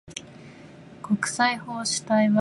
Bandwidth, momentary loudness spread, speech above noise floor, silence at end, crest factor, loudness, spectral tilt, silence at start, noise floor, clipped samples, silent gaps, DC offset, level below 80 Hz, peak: 11.5 kHz; 24 LU; 23 dB; 0 s; 18 dB; -24 LUFS; -4 dB/octave; 0.1 s; -46 dBFS; under 0.1%; none; under 0.1%; -66 dBFS; -8 dBFS